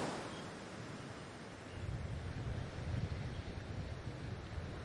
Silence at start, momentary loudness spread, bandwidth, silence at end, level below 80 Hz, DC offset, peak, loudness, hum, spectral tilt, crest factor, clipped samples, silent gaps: 0 s; 7 LU; 11.5 kHz; 0 s; -54 dBFS; under 0.1%; -28 dBFS; -46 LUFS; none; -6 dB/octave; 16 dB; under 0.1%; none